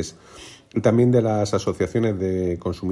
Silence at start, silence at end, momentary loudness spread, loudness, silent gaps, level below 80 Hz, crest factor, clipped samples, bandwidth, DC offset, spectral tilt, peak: 0 s; 0 s; 20 LU; -21 LUFS; none; -52 dBFS; 18 dB; under 0.1%; 12 kHz; under 0.1%; -7 dB/octave; -4 dBFS